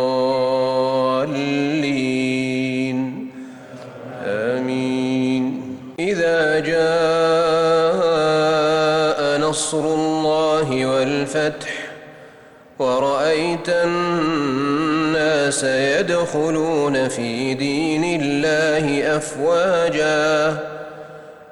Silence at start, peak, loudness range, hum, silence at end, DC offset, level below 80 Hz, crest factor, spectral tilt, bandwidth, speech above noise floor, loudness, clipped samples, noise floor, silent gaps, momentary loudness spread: 0 s; -8 dBFS; 5 LU; none; 0 s; under 0.1%; -54 dBFS; 12 dB; -4.5 dB/octave; 18 kHz; 26 dB; -19 LUFS; under 0.1%; -45 dBFS; none; 11 LU